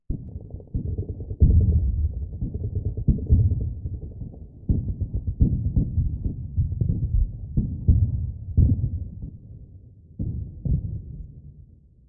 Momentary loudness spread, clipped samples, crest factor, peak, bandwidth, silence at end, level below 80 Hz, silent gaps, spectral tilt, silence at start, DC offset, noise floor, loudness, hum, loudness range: 18 LU; under 0.1%; 18 dB; -6 dBFS; 0.9 kHz; 0.45 s; -28 dBFS; none; -17 dB/octave; 0.1 s; under 0.1%; -50 dBFS; -26 LUFS; none; 4 LU